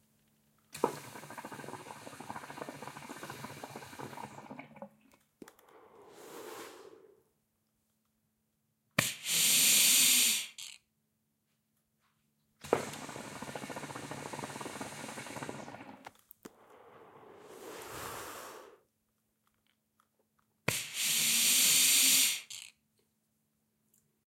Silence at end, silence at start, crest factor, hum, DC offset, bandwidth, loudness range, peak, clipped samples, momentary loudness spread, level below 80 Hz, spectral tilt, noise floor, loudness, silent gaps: 1.6 s; 0.75 s; 28 dB; none; under 0.1%; 16.5 kHz; 22 LU; -8 dBFS; under 0.1%; 26 LU; -76 dBFS; 0 dB/octave; -80 dBFS; -26 LUFS; none